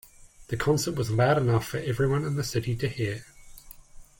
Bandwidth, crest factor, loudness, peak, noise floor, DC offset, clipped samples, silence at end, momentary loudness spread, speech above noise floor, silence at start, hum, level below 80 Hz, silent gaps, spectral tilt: 17 kHz; 18 dB; -27 LUFS; -10 dBFS; -47 dBFS; under 0.1%; under 0.1%; 0.15 s; 9 LU; 21 dB; 0.4 s; none; -50 dBFS; none; -6 dB/octave